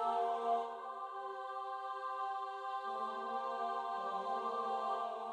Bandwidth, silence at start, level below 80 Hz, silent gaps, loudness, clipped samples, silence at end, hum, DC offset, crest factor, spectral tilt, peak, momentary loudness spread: 10.5 kHz; 0 s; under -90 dBFS; none; -40 LUFS; under 0.1%; 0 s; none; under 0.1%; 14 dB; -3.5 dB/octave; -24 dBFS; 8 LU